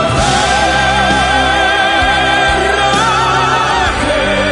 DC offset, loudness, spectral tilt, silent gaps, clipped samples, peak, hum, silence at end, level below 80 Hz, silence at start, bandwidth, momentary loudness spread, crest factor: under 0.1%; -11 LUFS; -3.5 dB/octave; none; under 0.1%; 0 dBFS; none; 0 s; -26 dBFS; 0 s; 11 kHz; 2 LU; 12 dB